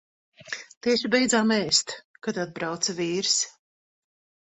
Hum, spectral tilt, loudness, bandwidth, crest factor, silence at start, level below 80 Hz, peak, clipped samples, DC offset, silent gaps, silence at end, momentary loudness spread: none; -2.5 dB/octave; -24 LUFS; 8.4 kHz; 20 dB; 0.4 s; -66 dBFS; -6 dBFS; under 0.1%; under 0.1%; 0.77-0.81 s, 2.05-2.14 s; 1 s; 15 LU